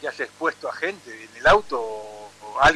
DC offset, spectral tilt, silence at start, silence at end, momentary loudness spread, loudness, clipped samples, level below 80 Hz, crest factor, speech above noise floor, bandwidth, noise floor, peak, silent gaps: under 0.1%; -3.5 dB/octave; 0 s; 0 s; 21 LU; -23 LUFS; under 0.1%; -44 dBFS; 16 dB; 17 dB; 13 kHz; -40 dBFS; -8 dBFS; none